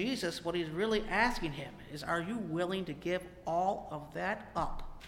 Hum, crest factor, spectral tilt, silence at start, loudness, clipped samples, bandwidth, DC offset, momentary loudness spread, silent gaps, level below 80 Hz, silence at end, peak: none; 20 dB; -5 dB/octave; 0 s; -35 LUFS; under 0.1%; 16.5 kHz; under 0.1%; 10 LU; none; -50 dBFS; 0 s; -16 dBFS